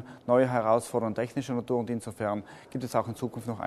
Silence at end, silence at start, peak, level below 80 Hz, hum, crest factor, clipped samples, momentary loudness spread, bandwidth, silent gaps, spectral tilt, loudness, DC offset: 0 s; 0 s; -10 dBFS; -66 dBFS; none; 18 dB; under 0.1%; 11 LU; 13.5 kHz; none; -6.5 dB/octave; -29 LUFS; under 0.1%